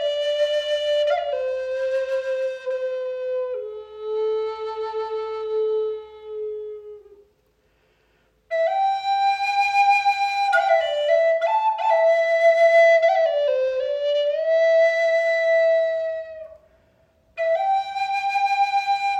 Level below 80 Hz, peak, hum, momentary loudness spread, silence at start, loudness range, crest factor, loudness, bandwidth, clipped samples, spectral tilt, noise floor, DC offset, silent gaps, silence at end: -66 dBFS; -8 dBFS; none; 12 LU; 0 s; 11 LU; 14 dB; -21 LUFS; 9.8 kHz; under 0.1%; -0.5 dB/octave; -64 dBFS; under 0.1%; none; 0 s